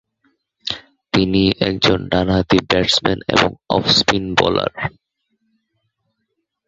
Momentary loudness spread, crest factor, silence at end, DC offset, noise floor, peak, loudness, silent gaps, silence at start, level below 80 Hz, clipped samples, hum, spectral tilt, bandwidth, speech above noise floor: 12 LU; 18 dB; 1.8 s; under 0.1%; -73 dBFS; 0 dBFS; -16 LUFS; none; 0.65 s; -40 dBFS; under 0.1%; none; -4.5 dB/octave; 8.2 kHz; 57 dB